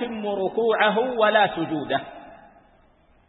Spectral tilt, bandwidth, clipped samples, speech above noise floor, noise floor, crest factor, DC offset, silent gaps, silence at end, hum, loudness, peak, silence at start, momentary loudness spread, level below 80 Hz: -9.5 dB/octave; 4.1 kHz; under 0.1%; 36 dB; -58 dBFS; 20 dB; under 0.1%; none; 0.9 s; none; -22 LUFS; -4 dBFS; 0 s; 9 LU; -62 dBFS